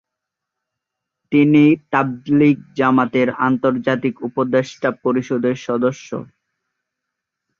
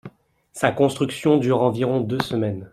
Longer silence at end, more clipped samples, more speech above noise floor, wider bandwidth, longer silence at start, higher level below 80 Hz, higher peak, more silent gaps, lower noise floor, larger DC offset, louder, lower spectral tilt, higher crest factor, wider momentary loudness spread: first, 1.35 s vs 0.05 s; neither; first, 65 dB vs 29 dB; second, 7.2 kHz vs 14.5 kHz; first, 1.3 s vs 0.05 s; about the same, -60 dBFS vs -58 dBFS; about the same, -2 dBFS vs -2 dBFS; neither; first, -82 dBFS vs -49 dBFS; neither; first, -17 LUFS vs -21 LUFS; about the same, -7.5 dB/octave vs -6.5 dB/octave; about the same, 16 dB vs 20 dB; first, 9 LU vs 6 LU